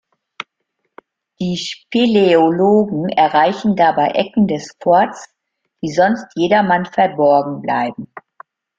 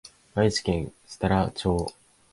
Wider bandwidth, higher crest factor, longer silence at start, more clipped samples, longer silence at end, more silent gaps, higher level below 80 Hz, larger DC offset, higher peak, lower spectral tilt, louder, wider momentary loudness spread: second, 7.6 kHz vs 11.5 kHz; about the same, 16 dB vs 18 dB; about the same, 0.4 s vs 0.35 s; neither; first, 0.6 s vs 0.4 s; neither; second, -58 dBFS vs -42 dBFS; neither; first, 0 dBFS vs -8 dBFS; about the same, -6 dB/octave vs -5.5 dB/octave; first, -15 LUFS vs -27 LUFS; first, 15 LU vs 10 LU